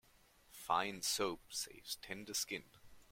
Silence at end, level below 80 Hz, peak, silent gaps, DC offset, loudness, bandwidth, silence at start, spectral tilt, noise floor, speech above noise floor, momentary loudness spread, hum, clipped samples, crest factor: 0.1 s; -72 dBFS; -20 dBFS; none; under 0.1%; -40 LUFS; 16.5 kHz; 0.5 s; -1.5 dB/octave; -69 dBFS; 27 dB; 10 LU; none; under 0.1%; 22 dB